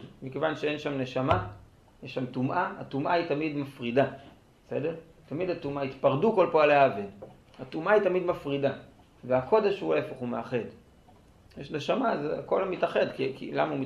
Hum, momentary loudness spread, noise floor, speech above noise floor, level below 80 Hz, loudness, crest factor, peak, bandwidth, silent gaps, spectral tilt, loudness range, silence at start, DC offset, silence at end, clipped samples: none; 15 LU; -57 dBFS; 29 dB; -58 dBFS; -28 LUFS; 22 dB; -8 dBFS; 11 kHz; none; -7 dB/octave; 5 LU; 0 s; under 0.1%; 0 s; under 0.1%